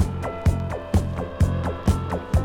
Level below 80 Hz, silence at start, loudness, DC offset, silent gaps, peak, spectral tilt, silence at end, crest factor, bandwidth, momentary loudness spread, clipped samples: -28 dBFS; 0 s; -25 LUFS; under 0.1%; none; -6 dBFS; -7.5 dB/octave; 0 s; 16 dB; 14.5 kHz; 3 LU; under 0.1%